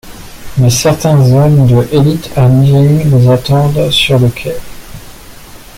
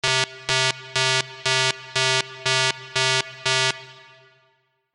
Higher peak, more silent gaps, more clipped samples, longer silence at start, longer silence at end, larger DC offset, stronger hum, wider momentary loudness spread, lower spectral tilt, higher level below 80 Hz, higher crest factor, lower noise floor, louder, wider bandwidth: about the same, 0 dBFS vs -2 dBFS; neither; neither; about the same, 0.05 s vs 0.05 s; second, 0.15 s vs 1 s; neither; neither; first, 6 LU vs 2 LU; first, -6 dB/octave vs -1.5 dB/octave; first, -32 dBFS vs -62 dBFS; second, 10 dB vs 22 dB; second, -31 dBFS vs -66 dBFS; first, -9 LUFS vs -21 LUFS; first, 16 kHz vs 12 kHz